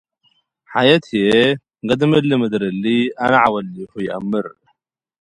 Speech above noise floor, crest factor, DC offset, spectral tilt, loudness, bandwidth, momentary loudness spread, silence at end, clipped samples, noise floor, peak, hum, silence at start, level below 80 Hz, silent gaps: 51 dB; 18 dB; under 0.1%; -6.5 dB/octave; -17 LUFS; 11 kHz; 11 LU; 0.7 s; under 0.1%; -67 dBFS; 0 dBFS; none; 0.7 s; -56 dBFS; none